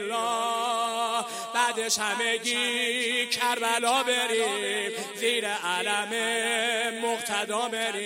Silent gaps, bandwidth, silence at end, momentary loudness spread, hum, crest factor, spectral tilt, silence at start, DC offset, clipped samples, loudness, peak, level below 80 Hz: none; 16 kHz; 0 s; 4 LU; none; 20 dB; -0.5 dB/octave; 0 s; under 0.1%; under 0.1%; -26 LUFS; -8 dBFS; -80 dBFS